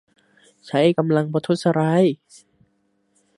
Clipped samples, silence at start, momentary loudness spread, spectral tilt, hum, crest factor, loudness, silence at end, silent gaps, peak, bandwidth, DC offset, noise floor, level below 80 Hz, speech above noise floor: under 0.1%; 0.65 s; 6 LU; -7 dB/octave; none; 18 dB; -20 LUFS; 1.2 s; none; -4 dBFS; 11.5 kHz; under 0.1%; -67 dBFS; -68 dBFS; 48 dB